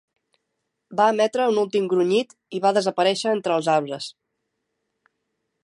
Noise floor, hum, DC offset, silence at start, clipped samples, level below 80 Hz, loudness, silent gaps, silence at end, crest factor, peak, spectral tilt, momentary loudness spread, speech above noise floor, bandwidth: -78 dBFS; none; under 0.1%; 0.9 s; under 0.1%; -78 dBFS; -22 LUFS; none; 1.55 s; 18 dB; -6 dBFS; -4.5 dB/octave; 12 LU; 57 dB; 11.5 kHz